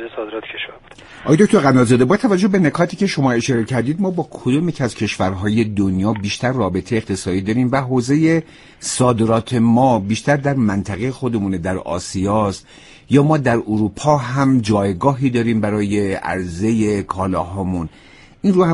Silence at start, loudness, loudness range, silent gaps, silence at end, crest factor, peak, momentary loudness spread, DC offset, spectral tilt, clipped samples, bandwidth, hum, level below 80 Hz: 0 s; -17 LUFS; 4 LU; none; 0 s; 16 dB; 0 dBFS; 9 LU; under 0.1%; -6.5 dB/octave; under 0.1%; 11.5 kHz; none; -46 dBFS